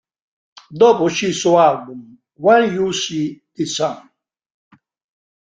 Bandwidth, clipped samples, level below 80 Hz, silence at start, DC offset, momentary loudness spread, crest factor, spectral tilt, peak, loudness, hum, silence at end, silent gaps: 9.4 kHz; under 0.1%; -62 dBFS; 0.7 s; under 0.1%; 19 LU; 16 dB; -4.5 dB/octave; -2 dBFS; -16 LUFS; none; 1.45 s; none